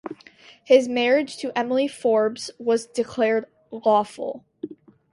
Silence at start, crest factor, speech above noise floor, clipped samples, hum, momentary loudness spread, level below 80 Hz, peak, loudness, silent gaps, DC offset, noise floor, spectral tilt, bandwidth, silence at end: 0.05 s; 20 dB; 29 dB; under 0.1%; none; 19 LU; -68 dBFS; -4 dBFS; -22 LUFS; none; under 0.1%; -50 dBFS; -4 dB/octave; 11.5 kHz; 0.4 s